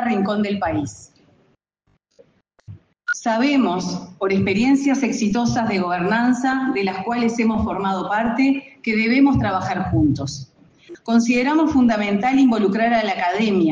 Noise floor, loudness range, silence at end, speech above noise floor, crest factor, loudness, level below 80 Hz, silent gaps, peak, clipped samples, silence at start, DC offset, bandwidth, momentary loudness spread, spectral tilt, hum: -66 dBFS; 6 LU; 0 s; 48 dB; 14 dB; -19 LUFS; -48 dBFS; none; -6 dBFS; under 0.1%; 0 s; under 0.1%; 9.2 kHz; 8 LU; -6 dB/octave; none